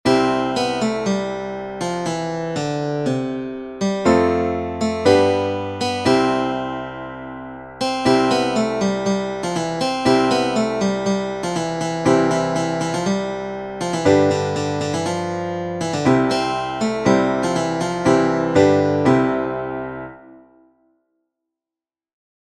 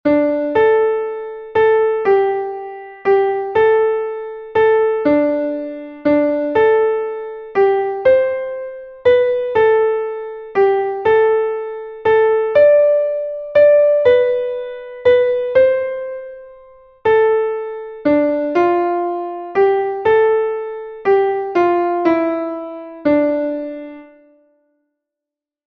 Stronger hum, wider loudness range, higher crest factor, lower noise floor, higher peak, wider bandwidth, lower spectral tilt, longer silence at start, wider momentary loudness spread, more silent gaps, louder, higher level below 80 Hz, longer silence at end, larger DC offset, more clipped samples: neither; about the same, 4 LU vs 4 LU; about the same, 18 dB vs 14 dB; first, under -90 dBFS vs -86 dBFS; about the same, -2 dBFS vs -2 dBFS; first, 12.5 kHz vs 5.2 kHz; second, -5.5 dB/octave vs -7.5 dB/octave; about the same, 0.05 s vs 0.05 s; second, 10 LU vs 13 LU; neither; second, -20 LUFS vs -16 LUFS; about the same, -50 dBFS vs -54 dBFS; first, 2.05 s vs 1.6 s; neither; neither